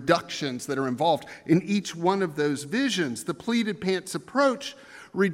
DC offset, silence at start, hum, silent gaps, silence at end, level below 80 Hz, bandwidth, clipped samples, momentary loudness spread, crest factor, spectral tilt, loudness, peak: under 0.1%; 0 s; none; none; 0 s; -68 dBFS; 16 kHz; under 0.1%; 7 LU; 20 dB; -5 dB/octave; -26 LUFS; -6 dBFS